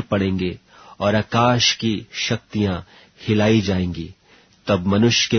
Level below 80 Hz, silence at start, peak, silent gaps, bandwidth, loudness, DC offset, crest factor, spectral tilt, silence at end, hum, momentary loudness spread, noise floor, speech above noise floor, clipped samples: -48 dBFS; 0 s; -4 dBFS; none; 6.6 kHz; -20 LUFS; under 0.1%; 18 dB; -4.5 dB/octave; 0 s; none; 15 LU; -53 dBFS; 34 dB; under 0.1%